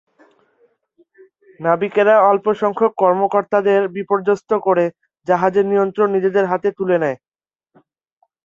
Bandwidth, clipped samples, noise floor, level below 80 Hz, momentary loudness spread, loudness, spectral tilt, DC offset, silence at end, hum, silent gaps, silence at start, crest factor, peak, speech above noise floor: 7.2 kHz; under 0.1%; under -90 dBFS; -66 dBFS; 6 LU; -17 LUFS; -7.5 dB/octave; under 0.1%; 1.3 s; none; none; 1.6 s; 16 dB; -2 dBFS; over 74 dB